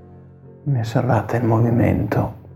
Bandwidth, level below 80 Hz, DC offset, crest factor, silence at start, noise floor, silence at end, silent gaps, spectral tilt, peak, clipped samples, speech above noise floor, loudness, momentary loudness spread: 15 kHz; -44 dBFS; under 0.1%; 16 dB; 0.05 s; -43 dBFS; 0 s; none; -9 dB/octave; -4 dBFS; under 0.1%; 25 dB; -19 LUFS; 6 LU